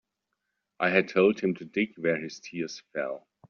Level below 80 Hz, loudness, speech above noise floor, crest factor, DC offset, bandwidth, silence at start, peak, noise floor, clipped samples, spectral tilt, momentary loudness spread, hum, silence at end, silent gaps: -72 dBFS; -28 LUFS; 55 dB; 20 dB; under 0.1%; 7 kHz; 0.8 s; -8 dBFS; -82 dBFS; under 0.1%; -4.5 dB/octave; 12 LU; none; 0.3 s; none